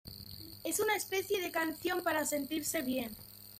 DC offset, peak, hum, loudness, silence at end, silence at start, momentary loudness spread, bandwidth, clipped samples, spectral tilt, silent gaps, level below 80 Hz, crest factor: under 0.1%; -20 dBFS; none; -35 LUFS; 0 s; 0.05 s; 14 LU; 16.5 kHz; under 0.1%; -2.5 dB/octave; none; -66 dBFS; 16 dB